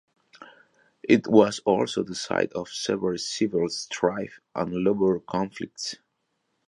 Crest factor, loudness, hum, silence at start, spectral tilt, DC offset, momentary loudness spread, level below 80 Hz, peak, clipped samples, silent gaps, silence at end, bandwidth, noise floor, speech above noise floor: 22 dB; -25 LUFS; none; 0.4 s; -5 dB/octave; under 0.1%; 14 LU; -62 dBFS; -4 dBFS; under 0.1%; none; 0.75 s; 11.5 kHz; -76 dBFS; 51 dB